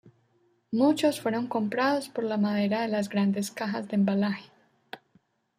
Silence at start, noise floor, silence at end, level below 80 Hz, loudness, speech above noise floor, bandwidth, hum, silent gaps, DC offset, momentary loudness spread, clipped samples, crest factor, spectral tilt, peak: 0.05 s; -68 dBFS; 0.6 s; -74 dBFS; -27 LUFS; 42 dB; 15 kHz; none; none; under 0.1%; 12 LU; under 0.1%; 16 dB; -6 dB/octave; -12 dBFS